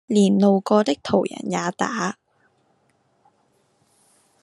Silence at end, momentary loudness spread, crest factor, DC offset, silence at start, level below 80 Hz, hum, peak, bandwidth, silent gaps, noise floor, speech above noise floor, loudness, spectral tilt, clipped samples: 2.3 s; 10 LU; 18 dB; under 0.1%; 0.1 s; -66 dBFS; none; -4 dBFS; 11 kHz; none; -65 dBFS; 45 dB; -21 LUFS; -6 dB/octave; under 0.1%